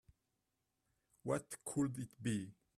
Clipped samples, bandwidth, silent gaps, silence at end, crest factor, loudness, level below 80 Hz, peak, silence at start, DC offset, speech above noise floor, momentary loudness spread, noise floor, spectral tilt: under 0.1%; 14 kHz; none; 0.25 s; 20 dB; -42 LUFS; -74 dBFS; -24 dBFS; 1.25 s; under 0.1%; 46 dB; 4 LU; -87 dBFS; -6 dB/octave